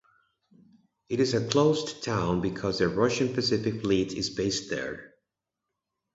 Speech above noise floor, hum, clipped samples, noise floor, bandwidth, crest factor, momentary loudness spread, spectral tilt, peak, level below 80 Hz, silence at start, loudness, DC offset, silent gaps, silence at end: 59 dB; none; under 0.1%; -86 dBFS; 8 kHz; 22 dB; 9 LU; -5 dB/octave; -6 dBFS; -54 dBFS; 1.1 s; -27 LUFS; under 0.1%; none; 1.1 s